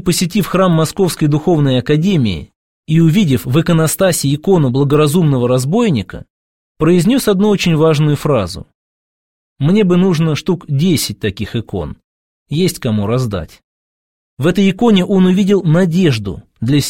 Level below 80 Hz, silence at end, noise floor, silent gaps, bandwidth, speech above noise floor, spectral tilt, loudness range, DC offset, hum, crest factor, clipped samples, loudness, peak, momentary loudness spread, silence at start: -40 dBFS; 0 s; under -90 dBFS; 2.56-2.83 s, 6.30-6.75 s, 8.75-9.56 s, 12.04-12.46 s, 13.64-14.37 s; 16.5 kHz; over 77 dB; -6 dB/octave; 5 LU; 0.7%; none; 14 dB; under 0.1%; -13 LUFS; 0 dBFS; 10 LU; 0 s